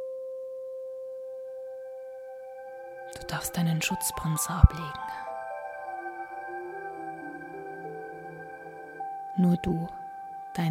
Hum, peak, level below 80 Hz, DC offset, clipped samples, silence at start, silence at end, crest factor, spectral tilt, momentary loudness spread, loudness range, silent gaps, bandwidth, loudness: none; 0 dBFS; -36 dBFS; under 0.1%; under 0.1%; 0 s; 0 s; 30 dB; -5.5 dB/octave; 17 LU; 10 LU; none; 16.5 kHz; -32 LUFS